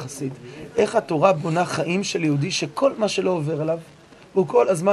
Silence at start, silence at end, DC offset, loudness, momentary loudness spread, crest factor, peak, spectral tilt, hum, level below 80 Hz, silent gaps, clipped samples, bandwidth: 0 s; 0 s; under 0.1%; -22 LUFS; 11 LU; 20 dB; -2 dBFS; -5.5 dB/octave; none; -60 dBFS; none; under 0.1%; 12.5 kHz